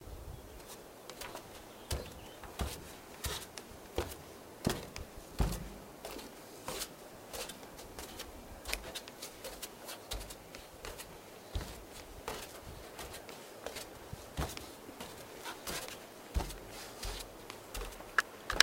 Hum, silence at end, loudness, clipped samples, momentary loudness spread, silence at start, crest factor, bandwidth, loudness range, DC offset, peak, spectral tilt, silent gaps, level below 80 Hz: none; 0 s; -43 LUFS; under 0.1%; 11 LU; 0 s; 42 dB; 17 kHz; 5 LU; under 0.1%; 0 dBFS; -2.5 dB/octave; none; -50 dBFS